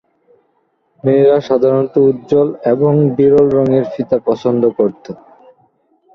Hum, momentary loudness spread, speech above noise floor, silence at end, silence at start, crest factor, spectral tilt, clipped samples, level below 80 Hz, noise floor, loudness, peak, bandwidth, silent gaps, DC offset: none; 7 LU; 49 dB; 1 s; 1.05 s; 12 dB; -9.5 dB/octave; under 0.1%; -52 dBFS; -61 dBFS; -13 LUFS; -2 dBFS; 6.2 kHz; none; under 0.1%